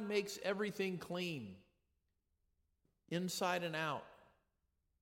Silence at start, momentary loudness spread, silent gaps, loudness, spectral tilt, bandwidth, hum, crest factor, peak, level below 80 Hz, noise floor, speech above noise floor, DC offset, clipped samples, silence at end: 0 s; 8 LU; none; -41 LUFS; -4.5 dB/octave; 16.5 kHz; none; 20 dB; -24 dBFS; -80 dBFS; -84 dBFS; 43 dB; under 0.1%; under 0.1%; 0.75 s